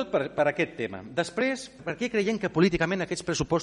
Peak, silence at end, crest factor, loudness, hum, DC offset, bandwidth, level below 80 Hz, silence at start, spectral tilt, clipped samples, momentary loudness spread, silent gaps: -10 dBFS; 0 s; 16 dB; -28 LUFS; none; under 0.1%; 10.5 kHz; -52 dBFS; 0 s; -5 dB/octave; under 0.1%; 8 LU; none